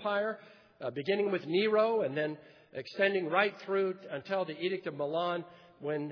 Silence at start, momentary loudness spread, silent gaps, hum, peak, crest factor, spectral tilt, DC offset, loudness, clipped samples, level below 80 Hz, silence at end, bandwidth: 0 s; 14 LU; none; none; -12 dBFS; 20 dB; -7 dB/octave; under 0.1%; -32 LUFS; under 0.1%; -84 dBFS; 0 s; 5.4 kHz